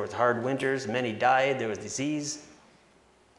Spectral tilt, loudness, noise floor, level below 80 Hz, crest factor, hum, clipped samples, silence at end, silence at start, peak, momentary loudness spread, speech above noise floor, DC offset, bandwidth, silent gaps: -4 dB/octave; -28 LUFS; -61 dBFS; -72 dBFS; 20 dB; none; under 0.1%; 0.85 s; 0 s; -10 dBFS; 9 LU; 33 dB; under 0.1%; 11.5 kHz; none